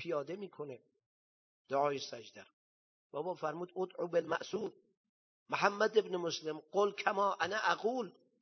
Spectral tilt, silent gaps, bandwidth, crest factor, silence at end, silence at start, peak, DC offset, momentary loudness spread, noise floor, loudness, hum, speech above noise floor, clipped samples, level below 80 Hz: -4 dB/octave; 1.06-1.65 s, 2.53-3.10 s, 4.97-5.46 s; 6.4 kHz; 24 dB; 0.3 s; 0 s; -14 dBFS; under 0.1%; 14 LU; under -90 dBFS; -36 LUFS; none; over 54 dB; under 0.1%; -86 dBFS